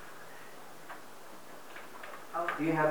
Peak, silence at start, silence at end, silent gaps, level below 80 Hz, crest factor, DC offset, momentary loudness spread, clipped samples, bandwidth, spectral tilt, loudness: -16 dBFS; 0 s; 0 s; none; -80 dBFS; 22 dB; 0.4%; 18 LU; under 0.1%; over 20 kHz; -6 dB/octave; -38 LUFS